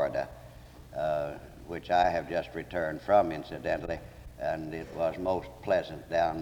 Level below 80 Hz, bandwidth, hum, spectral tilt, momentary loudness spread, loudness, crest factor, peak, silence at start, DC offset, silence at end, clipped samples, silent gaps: -52 dBFS; 20 kHz; none; -6 dB/octave; 16 LU; -31 LUFS; 18 dB; -12 dBFS; 0 s; under 0.1%; 0 s; under 0.1%; none